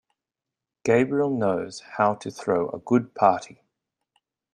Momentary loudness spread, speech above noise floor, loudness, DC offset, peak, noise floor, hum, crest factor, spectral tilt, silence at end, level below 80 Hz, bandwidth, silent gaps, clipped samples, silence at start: 10 LU; 64 dB; -24 LUFS; under 0.1%; -4 dBFS; -88 dBFS; none; 22 dB; -6.5 dB/octave; 1.1 s; -66 dBFS; 10.5 kHz; none; under 0.1%; 0.85 s